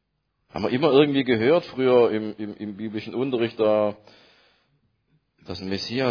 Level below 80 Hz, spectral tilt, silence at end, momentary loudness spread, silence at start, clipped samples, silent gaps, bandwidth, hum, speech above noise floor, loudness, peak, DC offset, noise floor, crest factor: -62 dBFS; -7 dB/octave; 0 s; 15 LU; 0.55 s; under 0.1%; none; 5.4 kHz; none; 51 dB; -23 LUFS; -4 dBFS; under 0.1%; -73 dBFS; 20 dB